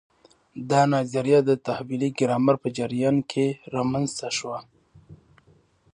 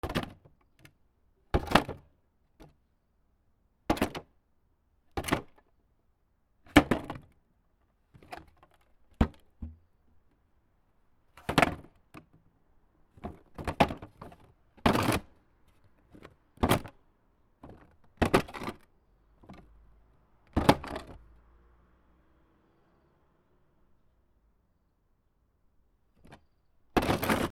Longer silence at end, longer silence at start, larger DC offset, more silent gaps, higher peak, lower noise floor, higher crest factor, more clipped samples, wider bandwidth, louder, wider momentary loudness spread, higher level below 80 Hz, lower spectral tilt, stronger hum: first, 0.8 s vs 0.05 s; first, 0.55 s vs 0.05 s; neither; neither; second, -6 dBFS vs -2 dBFS; second, -60 dBFS vs -72 dBFS; second, 18 dB vs 32 dB; neither; second, 10.5 kHz vs 17 kHz; first, -24 LUFS vs -30 LUFS; second, 9 LU vs 22 LU; second, -64 dBFS vs -48 dBFS; about the same, -6 dB/octave vs -5.5 dB/octave; neither